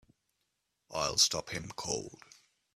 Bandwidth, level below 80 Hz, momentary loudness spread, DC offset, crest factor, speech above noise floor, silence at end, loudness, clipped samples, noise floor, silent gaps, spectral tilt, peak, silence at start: 15 kHz; -64 dBFS; 15 LU; under 0.1%; 24 dB; 48 dB; 0.6 s; -31 LUFS; under 0.1%; -82 dBFS; none; -1 dB/octave; -12 dBFS; 0.9 s